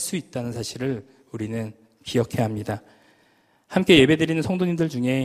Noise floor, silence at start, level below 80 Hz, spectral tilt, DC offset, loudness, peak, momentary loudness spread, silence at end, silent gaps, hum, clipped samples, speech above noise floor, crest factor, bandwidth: -61 dBFS; 0 s; -54 dBFS; -5.5 dB/octave; under 0.1%; -23 LUFS; 0 dBFS; 18 LU; 0 s; none; none; under 0.1%; 39 dB; 22 dB; 15.5 kHz